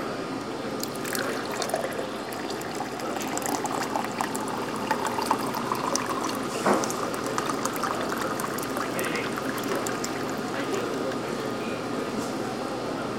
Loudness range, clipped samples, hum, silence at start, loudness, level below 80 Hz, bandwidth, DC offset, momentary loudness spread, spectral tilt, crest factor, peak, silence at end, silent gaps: 3 LU; under 0.1%; none; 0 s; -29 LUFS; -60 dBFS; 17 kHz; under 0.1%; 5 LU; -3.5 dB/octave; 22 dB; -6 dBFS; 0 s; none